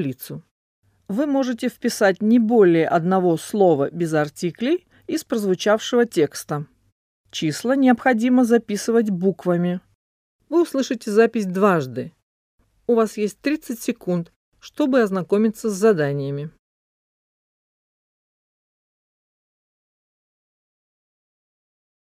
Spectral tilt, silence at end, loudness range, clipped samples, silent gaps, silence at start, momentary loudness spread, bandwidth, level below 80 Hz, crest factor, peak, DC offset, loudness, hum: -6 dB/octave; 5.5 s; 5 LU; under 0.1%; 0.51-0.83 s, 6.92-7.24 s, 9.95-10.39 s, 12.23-12.58 s, 14.36-14.52 s; 0 s; 13 LU; 15.5 kHz; -66 dBFS; 18 dB; -4 dBFS; under 0.1%; -20 LUFS; none